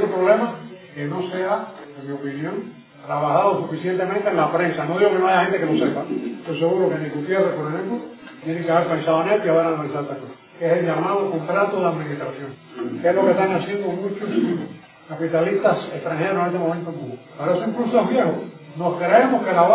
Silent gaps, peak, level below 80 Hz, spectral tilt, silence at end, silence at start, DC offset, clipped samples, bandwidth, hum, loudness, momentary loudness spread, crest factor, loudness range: none; -2 dBFS; -70 dBFS; -10.5 dB/octave; 0 s; 0 s; under 0.1%; under 0.1%; 4 kHz; none; -21 LUFS; 14 LU; 18 dB; 3 LU